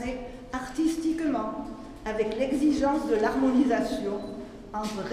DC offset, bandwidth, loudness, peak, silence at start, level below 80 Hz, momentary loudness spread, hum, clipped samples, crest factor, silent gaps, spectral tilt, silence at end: under 0.1%; 14.5 kHz; -28 LUFS; -12 dBFS; 0 s; -48 dBFS; 14 LU; none; under 0.1%; 16 dB; none; -5.5 dB/octave; 0 s